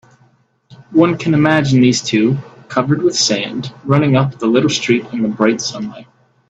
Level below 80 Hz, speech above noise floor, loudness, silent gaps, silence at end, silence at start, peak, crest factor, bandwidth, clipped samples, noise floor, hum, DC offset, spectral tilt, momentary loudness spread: -54 dBFS; 40 dB; -15 LUFS; none; 0.45 s; 0.7 s; 0 dBFS; 16 dB; 8.4 kHz; under 0.1%; -54 dBFS; none; under 0.1%; -5 dB/octave; 10 LU